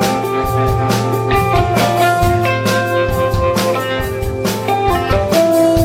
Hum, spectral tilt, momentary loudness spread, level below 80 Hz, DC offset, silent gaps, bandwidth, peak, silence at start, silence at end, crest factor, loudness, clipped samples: none; -5.5 dB/octave; 5 LU; -28 dBFS; under 0.1%; none; 16.5 kHz; 0 dBFS; 0 s; 0 s; 14 dB; -15 LUFS; under 0.1%